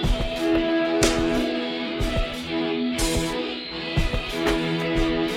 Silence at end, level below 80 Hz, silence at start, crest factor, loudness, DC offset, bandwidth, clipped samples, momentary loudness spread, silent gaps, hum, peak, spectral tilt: 0 s; -32 dBFS; 0 s; 18 dB; -24 LUFS; under 0.1%; 16 kHz; under 0.1%; 7 LU; none; none; -6 dBFS; -4.5 dB/octave